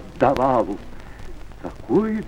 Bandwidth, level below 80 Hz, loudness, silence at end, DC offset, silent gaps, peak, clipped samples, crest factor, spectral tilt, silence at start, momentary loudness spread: 14 kHz; -40 dBFS; -21 LUFS; 0 s; under 0.1%; none; -4 dBFS; under 0.1%; 18 dB; -8 dB/octave; 0 s; 23 LU